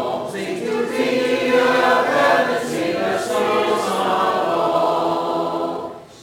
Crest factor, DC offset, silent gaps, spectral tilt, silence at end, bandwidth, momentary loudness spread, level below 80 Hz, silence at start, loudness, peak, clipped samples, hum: 14 dB; under 0.1%; none; -4 dB/octave; 0 s; 17 kHz; 9 LU; -62 dBFS; 0 s; -19 LUFS; -4 dBFS; under 0.1%; none